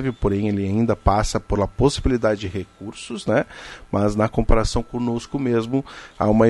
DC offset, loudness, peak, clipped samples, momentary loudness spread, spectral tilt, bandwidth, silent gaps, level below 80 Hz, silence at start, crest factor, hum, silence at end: under 0.1%; -22 LUFS; -2 dBFS; under 0.1%; 12 LU; -6.5 dB/octave; 11.5 kHz; none; -30 dBFS; 0 s; 20 dB; none; 0 s